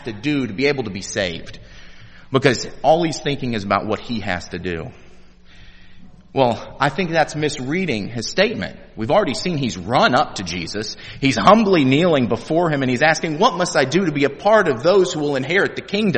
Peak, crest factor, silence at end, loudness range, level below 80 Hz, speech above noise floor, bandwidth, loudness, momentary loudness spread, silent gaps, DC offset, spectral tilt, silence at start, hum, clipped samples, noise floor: 0 dBFS; 18 dB; 0 s; 7 LU; -46 dBFS; 24 dB; 8.8 kHz; -19 LUFS; 10 LU; none; under 0.1%; -5 dB/octave; 0 s; none; under 0.1%; -42 dBFS